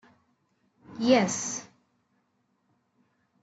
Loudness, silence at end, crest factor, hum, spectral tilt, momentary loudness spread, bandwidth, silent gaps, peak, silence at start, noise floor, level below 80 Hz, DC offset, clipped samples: -26 LUFS; 1.8 s; 22 dB; none; -3.5 dB/octave; 16 LU; 8.2 kHz; none; -10 dBFS; 0.9 s; -73 dBFS; -74 dBFS; under 0.1%; under 0.1%